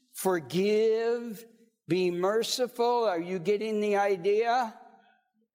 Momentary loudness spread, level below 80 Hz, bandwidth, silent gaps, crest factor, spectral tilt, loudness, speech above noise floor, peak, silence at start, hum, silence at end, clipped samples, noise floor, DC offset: 6 LU; -82 dBFS; 16.5 kHz; none; 14 dB; -4.5 dB/octave; -28 LUFS; 40 dB; -14 dBFS; 0.15 s; none; 0.7 s; under 0.1%; -68 dBFS; under 0.1%